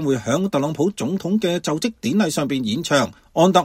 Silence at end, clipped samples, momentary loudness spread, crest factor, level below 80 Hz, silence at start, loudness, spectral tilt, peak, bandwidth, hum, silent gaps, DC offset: 0 s; under 0.1%; 4 LU; 18 dB; -56 dBFS; 0 s; -21 LUFS; -5 dB/octave; -2 dBFS; 16.5 kHz; none; none; under 0.1%